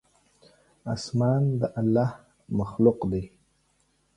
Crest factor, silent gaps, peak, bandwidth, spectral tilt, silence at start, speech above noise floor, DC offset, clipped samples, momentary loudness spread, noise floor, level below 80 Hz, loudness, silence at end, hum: 20 dB; none; -8 dBFS; 11 kHz; -8 dB/octave; 0.85 s; 44 dB; under 0.1%; under 0.1%; 11 LU; -68 dBFS; -52 dBFS; -26 LUFS; 0.9 s; none